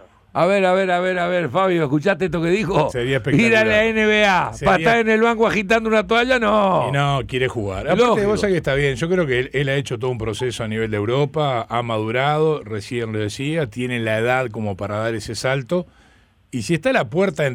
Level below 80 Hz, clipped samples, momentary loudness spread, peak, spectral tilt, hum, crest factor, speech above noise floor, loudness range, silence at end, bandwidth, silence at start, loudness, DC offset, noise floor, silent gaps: -44 dBFS; under 0.1%; 9 LU; -6 dBFS; -5.5 dB/octave; none; 12 dB; 35 dB; 6 LU; 0 s; 15.5 kHz; 0.35 s; -19 LUFS; under 0.1%; -54 dBFS; none